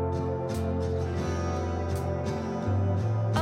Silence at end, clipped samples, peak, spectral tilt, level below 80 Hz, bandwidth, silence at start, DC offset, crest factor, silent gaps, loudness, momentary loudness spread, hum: 0 s; under 0.1%; -14 dBFS; -7.5 dB/octave; -42 dBFS; 13 kHz; 0 s; under 0.1%; 14 dB; none; -30 LUFS; 3 LU; none